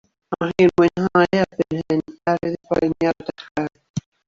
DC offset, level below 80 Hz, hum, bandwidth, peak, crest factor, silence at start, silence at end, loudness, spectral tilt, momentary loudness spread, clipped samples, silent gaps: under 0.1%; -52 dBFS; none; 7.4 kHz; -4 dBFS; 18 dB; 0.3 s; 0.3 s; -20 LUFS; -7 dB/octave; 12 LU; under 0.1%; 3.51-3.55 s, 3.90-3.94 s